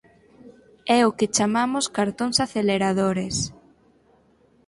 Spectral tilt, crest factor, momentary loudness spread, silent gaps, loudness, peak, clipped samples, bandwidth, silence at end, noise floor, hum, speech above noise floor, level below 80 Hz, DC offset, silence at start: -4 dB/octave; 18 dB; 7 LU; none; -22 LUFS; -6 dBFS; under 0.1%; 11.5 kHz; 1.15 s; -59 dBFS; none; 37 dB; -56 dBFS; under 0.1%; 0.45 s